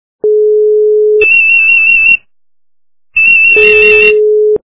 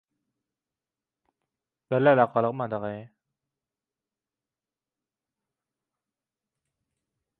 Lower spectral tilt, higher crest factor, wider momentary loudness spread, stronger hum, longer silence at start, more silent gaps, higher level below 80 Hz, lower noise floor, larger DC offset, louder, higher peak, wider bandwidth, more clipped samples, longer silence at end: second, -7 dB/octave vs -10 dB/octave; second, 8 dB vs 26 dB; second, 7 LU vs 15 LU; neither; second, 0.25 s vs 1.9 s; neither; first, -44 dBFS vs -74 dBFS; about the same, under -90 dBFS vs under -90 dBFS; neither; first, -5 LUFS vs -24 LUFS; first, 0 dBFS vs -6 dBFS; about the same, 4 kHz vs 4.3 kHz; first, 0.9% vs under 0.1%; second, 0.15 s vs 4.35 s